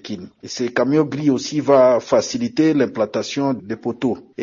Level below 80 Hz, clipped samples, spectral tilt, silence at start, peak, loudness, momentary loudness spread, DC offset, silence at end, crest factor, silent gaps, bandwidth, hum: -62 dBFS; under 0.1%; -5.5 dB/octave; 0.05 s; -2 dBFS; -19 LUFS; 12 LU; under 0.1%; 0 s; 16 dB; none; 7.4 kHz; none